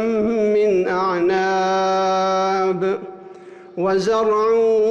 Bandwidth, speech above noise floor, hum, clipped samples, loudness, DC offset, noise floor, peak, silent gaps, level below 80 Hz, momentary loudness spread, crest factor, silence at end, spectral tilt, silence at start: 8.4 kHz; 23 dB; none; under 0.1%; -18 LUFS; under 0.1%; -40 dBFS; -10 dBFS; none; -58 dBFS; 8 LU; 8 dB; 0 s; -5.5 dB/octave; 0 s